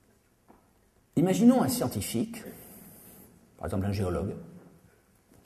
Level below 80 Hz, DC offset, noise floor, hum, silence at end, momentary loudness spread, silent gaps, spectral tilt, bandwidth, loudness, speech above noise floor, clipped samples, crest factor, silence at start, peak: -54 dBFS; under 0.1%; -65 dBFS; none; 0.85 s; 27 LU; none; -6 dB/octave; 13.5 kHz; -28 LUFS; 38 dB; under 0.1%; 22 dB; 1.15 s; -10 dBFS